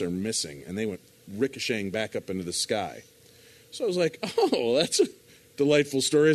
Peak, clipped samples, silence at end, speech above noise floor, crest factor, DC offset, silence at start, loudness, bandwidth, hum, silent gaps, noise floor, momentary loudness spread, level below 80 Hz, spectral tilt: -8 dBFS; under 0.1%; 0 s; 28 dB; 20 dB; under 0.1%; 0 s; -27 LUFS; 13.5 kHz; none; none; -54 dBFS; 13 LU; -66 dBFS; -4 dB/octave